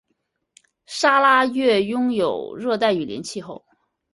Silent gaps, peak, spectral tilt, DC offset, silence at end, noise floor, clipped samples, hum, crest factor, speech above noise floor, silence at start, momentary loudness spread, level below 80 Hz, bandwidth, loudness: none; -4 dBFS; -4 dB/octave; under 0.1%; 0.55 s; -73 dBFS; under 0.1%; none; 18 dB; 54 dB; 0.9 s; 16 LU; -64 dBFS; 11.5 kHz; -19 LUFS